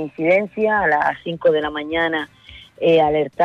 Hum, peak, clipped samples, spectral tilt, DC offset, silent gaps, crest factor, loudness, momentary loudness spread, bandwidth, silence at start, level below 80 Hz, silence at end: none; -6 dBFS; under 0.1%; -7 dB/octave; under 0.1%; none; 12 dB; -18 LUFS; 6 LU; 7 kHz; 0 s; -50 dBFS; 0 s